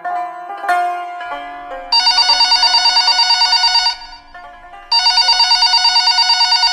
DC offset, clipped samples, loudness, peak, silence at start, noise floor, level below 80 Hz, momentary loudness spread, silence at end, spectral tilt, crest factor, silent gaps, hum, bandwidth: under 0.1%; under 0.1%; -10 LUFS; 0 dBFS; 0 s; -36 dBFS; -46 dBFS; 17 LU; 0 s; 2.5 dB/octave; 14 dB; none; none; 13 kHz